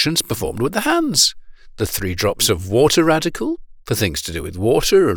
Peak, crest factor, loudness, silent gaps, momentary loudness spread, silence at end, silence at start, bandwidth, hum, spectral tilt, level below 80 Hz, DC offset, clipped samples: -2 dBFS; 16 dB; -18 LUFS; none; 11 LU; 0 s; 0 s; over 20 kHz; none; -3.5 dB/octave; -38 dBFS; under 0.1%; under 0.1%